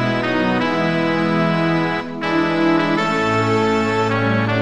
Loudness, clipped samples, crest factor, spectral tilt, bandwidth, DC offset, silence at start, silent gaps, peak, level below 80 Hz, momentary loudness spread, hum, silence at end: -18 LUFS; under 0.1%; 14 dB; -6.5 dB/octave; 10.5 kHz; 0.8%; 0 s; none; -4 dBFS; -50 dBFS; 2 LU; none; 0 s